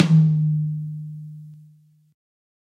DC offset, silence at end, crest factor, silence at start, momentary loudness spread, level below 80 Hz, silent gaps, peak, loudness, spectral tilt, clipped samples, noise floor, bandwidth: under 0.1%; 1.15 s; 18 dB; 0 s; 23 LU; -64 dBFS; none; -4 dBFS; -21 LUFS; -8.5 dB/octave; under 0.1%; -54 dBFS; 6.4 kHz